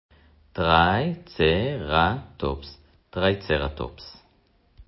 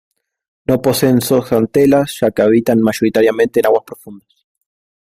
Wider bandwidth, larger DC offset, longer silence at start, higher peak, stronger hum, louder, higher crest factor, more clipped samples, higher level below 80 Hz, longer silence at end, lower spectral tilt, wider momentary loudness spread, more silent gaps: second, 5.8 kHz vs 16 kHz; neither; second, 0.55 s vs 0.7 s; second, -4 dBFS vs 0 dBFS; neither; second, -23 LUFS vs -13 LUFS; first, 22 dB vs 14 dB; neither; first, -40 dBFS vs -50 dBFS; second, 0.05 s vs 0.85 s; first, -10 dB/octave vs -6 dB/octave; first, 18 LU vs 6 LU; neither